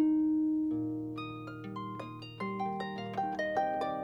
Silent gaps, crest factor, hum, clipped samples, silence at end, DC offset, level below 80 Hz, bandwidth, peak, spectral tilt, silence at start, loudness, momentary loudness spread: none; 14 dB; none; under 0.1%; 0 s; under 0.1%; -68 dBFS; 6.6 kHz; -20 dBFS; -7.5 dB/octave; 0 s; -35 LUFS; 12 LU